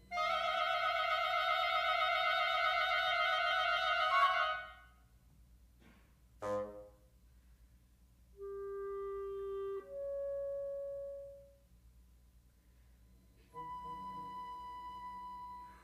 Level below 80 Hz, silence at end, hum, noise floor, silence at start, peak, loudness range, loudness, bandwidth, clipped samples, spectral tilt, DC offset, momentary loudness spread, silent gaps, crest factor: -66 dBFS; 0.05 s; none; -66 dBFS; 0 s; -20 dBFS; 18 LU; -35 LUFS; 15 kHz; under 0.1%; -2.5 dB/octave; under 0.1%; 16 LU; none; 20 dB